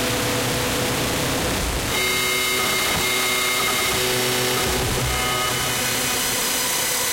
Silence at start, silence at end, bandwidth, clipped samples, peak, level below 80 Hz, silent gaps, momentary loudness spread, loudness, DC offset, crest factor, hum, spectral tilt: 0 s; 0 s; 16.5 kHz; under 0.1%; -10 dBFS; -38 dBFS; none; 3 LU; -20 LUFS; under 0.1%; 10 dB; none; -2 dB/octave